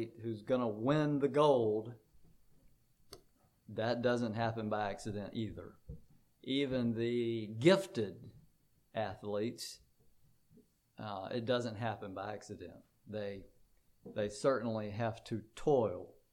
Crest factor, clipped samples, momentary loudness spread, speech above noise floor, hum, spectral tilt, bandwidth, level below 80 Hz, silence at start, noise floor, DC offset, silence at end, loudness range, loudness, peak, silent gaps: 22 dB; under 0.1%; 19 LU; 35 dB; none; -6.5 dB/octave; 15.5 kHz; -66 dBFS; 0 s; -70 dBFS; under 0.1%; 0.2 s; 7 LU; -36 LUFS; -16 dBFS; none